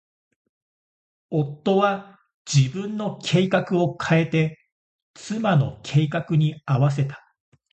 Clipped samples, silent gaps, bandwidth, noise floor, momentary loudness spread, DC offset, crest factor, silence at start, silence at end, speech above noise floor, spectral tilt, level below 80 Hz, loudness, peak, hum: under 0.1%; 2.34-2.45 s, 4.72-5.14 s; 8.6 kHz; under -90 dBFS; 8 LU; under 0.1%; 18 dB; 1.3 s; 0.55 s; over 69 dB; -6.5 dB/octave; -58 dBFS; -23 LUFS; -6 dBFS; none